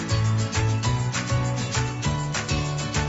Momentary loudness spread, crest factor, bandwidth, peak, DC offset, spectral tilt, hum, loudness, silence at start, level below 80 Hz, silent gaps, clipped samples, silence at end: 3 LU; 12 dB; 8 kHz; -12 dBFS; under 0.1%; -4.5 dB/octave; none; -25 LUFS; 0 s; -38 dBFS; none; under 0.1%; 0 s